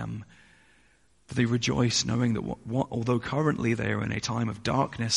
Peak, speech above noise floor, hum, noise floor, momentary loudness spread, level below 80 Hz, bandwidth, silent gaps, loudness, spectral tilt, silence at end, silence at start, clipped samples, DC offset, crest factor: -10 dBFS; 37 dB; none; -64 dBFS; 7 LU; -52 dBFS; 11.5 kHz; none; -28 LUFS; -5 dB/octave; 0 s; 0 s; under 0.1%; under 0.1%; 18 dB